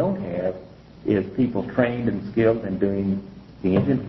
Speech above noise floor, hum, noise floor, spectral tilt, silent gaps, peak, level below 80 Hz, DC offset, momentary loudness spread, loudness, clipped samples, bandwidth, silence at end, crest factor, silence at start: 21 dB; none; -42 dBFS; -10.5 dB/octave; none; -6 dBFS; -48 dBFS; under 0.1%; 9 LU; -24 LUFS; under 0.1%; 5.8 kHz; 0 s; 16 dB; 0 s